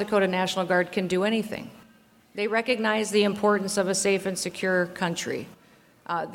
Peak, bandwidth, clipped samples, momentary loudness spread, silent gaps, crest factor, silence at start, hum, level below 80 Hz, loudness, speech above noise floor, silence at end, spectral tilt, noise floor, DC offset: -8 dBFS; 16.5 kHz; under 0.1%; 12 LU; none; 18 dB; 0 s; none; -66 dBFS; -25 LUFS; 32 dB; 0 s; -4 dB/octave; -57 dBFS; under 0.1%